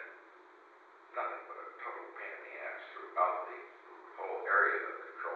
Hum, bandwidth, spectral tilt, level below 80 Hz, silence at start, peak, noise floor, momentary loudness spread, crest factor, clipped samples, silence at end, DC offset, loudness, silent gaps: none; 7 kHz; -2.5 dB/octave; under -90 dBFS; 0 s; -16 dBFS; -59 dBFS; 21 LU; 22 dB; under 0.1%; 0 s; under 0.1%; -36 LUFS; none